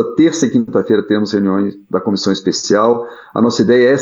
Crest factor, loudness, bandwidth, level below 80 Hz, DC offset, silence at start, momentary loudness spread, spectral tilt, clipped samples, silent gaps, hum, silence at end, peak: 12 dB; -14 LUFS; 8 kHz; -58 dBFS; under 0.1%; 0 s; 7 LU; -5 dB/octave; under 0.1%; none; none; 0 s; 0 dBFS